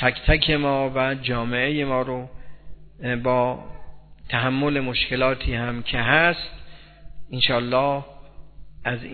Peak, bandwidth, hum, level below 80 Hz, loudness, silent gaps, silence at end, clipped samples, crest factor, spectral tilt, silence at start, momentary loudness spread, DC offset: -2 dBFS; 4.6 kHz; none; -36 dBFS; -22 LUFS; none; 0 s; under 0.1%; 22 dB; -8.5 dB/octave; 0 s; 12 LU; under 0.1%